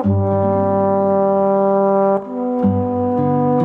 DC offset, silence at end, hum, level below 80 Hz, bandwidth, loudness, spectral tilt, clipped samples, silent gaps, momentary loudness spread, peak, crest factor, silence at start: under 0.1%; 0 s; none; -54 dBFS; 3.7 kHz; -16 LUFS; -12 dB/octave; under 0.1%; none; 4 LU; -6 dBFS; 10 dB; 0 s